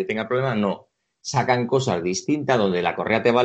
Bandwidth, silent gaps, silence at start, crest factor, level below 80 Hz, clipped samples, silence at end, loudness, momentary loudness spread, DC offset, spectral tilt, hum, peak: 8.6 kHz; none; 0 s; 18 dB; -60 dBFS; under 0.1%; 0 s; -22 LUFS; 6 LU; under 0.1%; -5 dB/octave; none; -4 dBFS